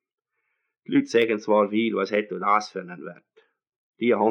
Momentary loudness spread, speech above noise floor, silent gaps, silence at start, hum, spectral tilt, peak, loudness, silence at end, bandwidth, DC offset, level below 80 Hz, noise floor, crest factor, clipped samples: 15 LU; 54 dB; 3.76-3.93 s; 0.9 s; none; -5.5 dB/octave; -8 dBFS; -23 LUFS; 0 s; 9.4 kHz; under 0.1%; -84 dBFS; -77 dBFS; 18 dB; under 0.1%